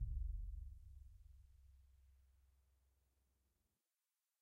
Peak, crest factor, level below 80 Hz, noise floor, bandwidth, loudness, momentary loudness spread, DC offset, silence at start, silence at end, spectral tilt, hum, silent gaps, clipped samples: -34 dBFS; 20 dB; -54 dBFS; under -90 dBFS; 0.5 kHz; -53 LUFS; 20 LU; under 0.1%; 0 s; 2.15 s; -7.5 dB/octave; none; none; under 0.1%